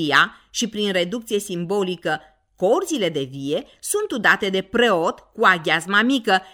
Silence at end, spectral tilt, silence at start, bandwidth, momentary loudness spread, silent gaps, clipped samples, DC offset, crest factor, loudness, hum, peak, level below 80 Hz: 0.05 s; -3.5 dB/octave; 0 s; 18.5 kHz; 9 LU; none; under 0.1%; under 0.1%; 20 dB; -20 LUFS; none; -2 dBFS; -60 dBFS